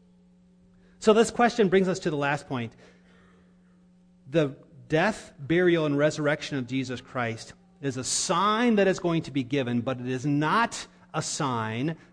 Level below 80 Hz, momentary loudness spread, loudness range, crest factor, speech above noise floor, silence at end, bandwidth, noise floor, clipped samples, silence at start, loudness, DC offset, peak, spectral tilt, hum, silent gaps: -60 dBFS; 11 LU; 4 LU; 20 dB; 33 dB; 0.15 s; 10.5 kHz; -58 dBFS; under 0.1%; 1 s; -26 LUFS; under 0.1%; -8 dBFS; -5 dB/octave; none; none